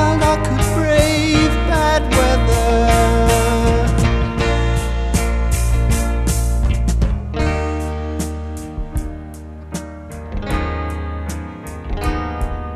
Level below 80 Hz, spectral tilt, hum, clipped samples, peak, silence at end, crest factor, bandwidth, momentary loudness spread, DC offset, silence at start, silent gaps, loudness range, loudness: -20 dBFS; -5.5 dB/octave; none; under 0.1%; 0 dBFS; 0 s; 16 dB; 14 kHz; 15 LU; under 0.1%; 0 s; none; 11 LU; -18 LUFS